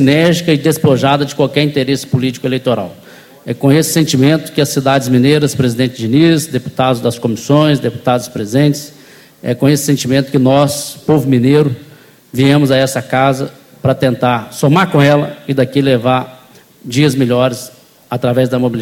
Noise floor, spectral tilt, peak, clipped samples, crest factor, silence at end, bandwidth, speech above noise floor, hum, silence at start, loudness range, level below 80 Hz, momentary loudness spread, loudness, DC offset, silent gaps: -39 dBFS; -6 dB/octave; 0 dBFS; under 0.1%; 12 dB; 0 s; 16.5 kHz; 27 dB; none; 0 s; 2 LU; -48 dBFS; 9 LU; -12 LUFS; under 0.1%; none